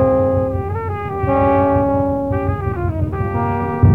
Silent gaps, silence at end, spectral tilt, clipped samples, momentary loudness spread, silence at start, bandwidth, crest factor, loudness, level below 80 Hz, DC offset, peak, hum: none; 0 s; -11 dB/octave; under 0.1%; 7 LU; 0 s; 3.8 kHz; 16 dB; -18 LUFS; -32 dBFS; 0.7%; -2 dBFS; none